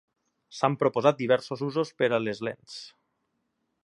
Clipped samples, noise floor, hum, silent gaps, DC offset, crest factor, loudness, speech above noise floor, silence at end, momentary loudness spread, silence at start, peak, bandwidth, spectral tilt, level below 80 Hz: under 0.1%; -77 dBFS; none; none; under 0.1%; 22 dB; -27 LUFS; 51 dB; 0.95 s; 18 LU; 0.5 s; -6 dBFS; 11 kHz; -6 dB/octave; -74 dBFS